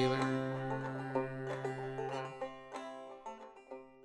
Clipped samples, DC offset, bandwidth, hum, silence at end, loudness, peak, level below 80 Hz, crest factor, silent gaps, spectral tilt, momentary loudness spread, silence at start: under 0.1%; under 0.1%; 11.5 kHz; none; 0 s; -40 LUFS; -20 dBFS; -70 dBFS; 20 dB; none; -6.5 dB/octave; 15 LU; 0 s